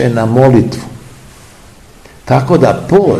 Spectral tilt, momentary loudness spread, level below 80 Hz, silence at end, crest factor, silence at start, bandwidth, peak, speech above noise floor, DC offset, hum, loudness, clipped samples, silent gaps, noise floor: -8 dB/octave; 13 LU; -38 dBFS; 0 s; 12 dB; 0 s; 13 kHz; 0 dBFS; 29 dB; 0.4%; none; -10 LUFS; 0.8%; none; -38 dBFS